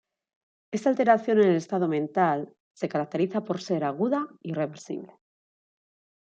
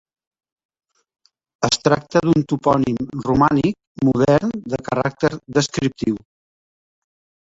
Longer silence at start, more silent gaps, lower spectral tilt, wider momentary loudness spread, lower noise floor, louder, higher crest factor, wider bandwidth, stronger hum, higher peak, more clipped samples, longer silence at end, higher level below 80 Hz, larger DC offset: second, 0.7 s vs 1.6 s; first, 2.60-2.75 s vs 3.87-3.95 s; first, -7 dB/octave vs -5.5 dB/octave; first, 13 LU vs 8 LU; about the same, under -90 dBFS vs under -90 dBFS; second, -26 LUFS vs -19 LUFS; about the same, 20 dB vs 18 dB; about the same, 8.8 kHz vs 8 kHz; neither; second, -6 dBFS vs -2 dBFS; neither; about the same, 1.3 s vs 1.4 s; second, -76 dBFS vs -48 dBFS; neither